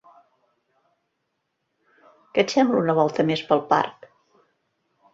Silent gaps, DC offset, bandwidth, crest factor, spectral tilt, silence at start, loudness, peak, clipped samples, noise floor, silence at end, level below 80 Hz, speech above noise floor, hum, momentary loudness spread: none; under 0.1%; 7.8 kHz; 22 dB; -5.5 dB/octave; 2.35 s; -22 LUFS; -4 dBFS; under 0.1%; -76 dBFS; 1.2 s; -68 dBFS; 56 dB; none; 5 LU